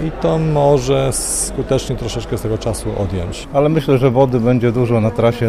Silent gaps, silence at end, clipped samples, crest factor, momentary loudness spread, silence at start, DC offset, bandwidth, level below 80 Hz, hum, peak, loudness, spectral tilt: none; 0 s; under 0.1%; 14 dB; 8 LU; 0 s; under 0.1%; 15.5 kHz; -32 dBFS; none; -2 dBFS; -16 LUFS; -6 dB/octave